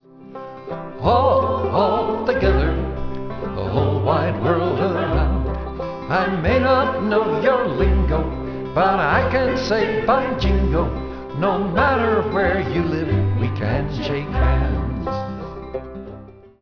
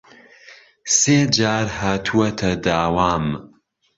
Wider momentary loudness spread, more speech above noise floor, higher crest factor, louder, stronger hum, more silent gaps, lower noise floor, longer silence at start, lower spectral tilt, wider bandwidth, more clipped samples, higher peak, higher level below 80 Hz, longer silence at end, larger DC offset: first, 12 LU vs 9 LU; second, 21 dB vs 29 dB; about the same, 16 dB vs 18 dB; about the same, -20 LUFS vs -18 LUFS; neither; neither; second, -40 dBFS vs -47 dBFS; second, 0.15 s vs 0.5 s; first, -8 dB/octave vs -3.5 dB/octave; second, 5.4 kHz vs 8 kHz; neither; about the same, -2 dBFS vs -2 dBFS; first, -28 dBFS vs -42 dBFS; second, 0.15 s vs 0.5 s; first, 0.3% vs under 0.1%